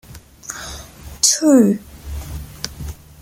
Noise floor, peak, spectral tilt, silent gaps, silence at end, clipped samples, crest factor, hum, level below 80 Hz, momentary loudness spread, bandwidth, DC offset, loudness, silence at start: -36 dBFS; 0 dBFS; -3.5 dB/octave; none; 0.25 s; under 0.1%; 20 dB; none; -38 dBFS; 22 LU; 17 kHz; under 0.1%; -15 LUFS; 0.1 s